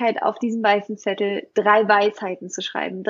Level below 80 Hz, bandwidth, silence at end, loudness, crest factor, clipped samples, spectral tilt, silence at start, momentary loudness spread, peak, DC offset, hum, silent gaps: -78 dBFS; 7.6 kHz; 0 s; -21 LUFS; 18 dB; under 0.1%; -4 dB/octave; 0 s; 12 LU; -4 dBFS; under 0.1%; none; none